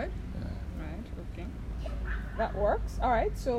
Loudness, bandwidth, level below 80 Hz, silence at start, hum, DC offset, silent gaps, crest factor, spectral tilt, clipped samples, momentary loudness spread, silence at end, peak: -34 LUFS; 12.5 kHz; -36 dBFS; 0 s; none; under 0.1%; none; 16 dB; -7 dB/octave; under 0.1%; 12 LU; 0 s; -16 dBFS